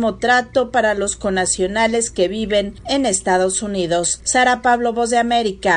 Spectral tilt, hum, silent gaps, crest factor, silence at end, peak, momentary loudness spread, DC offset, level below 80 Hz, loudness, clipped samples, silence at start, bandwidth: -2.5 dB/octave; none; none; 16 dB; 0 s; -2 dBFS; 5 LU; under 0.1%; -42 dBFS; -17 LUFS; under 0.1%; 0 s; 11 kHz